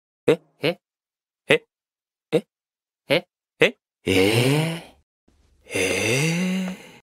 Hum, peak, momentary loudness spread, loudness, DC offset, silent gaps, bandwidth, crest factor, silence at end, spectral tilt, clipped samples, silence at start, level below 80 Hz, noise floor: none; 0 dBFS; 10 LU; -22 LUFS; under 0.1%; 5.03-5.27 s; 16 kHz; 24 dB; 0.15 s; -4.5 dB/octave; under 0.1%; 0.25 s; -62 dBFS; under -90 dBFS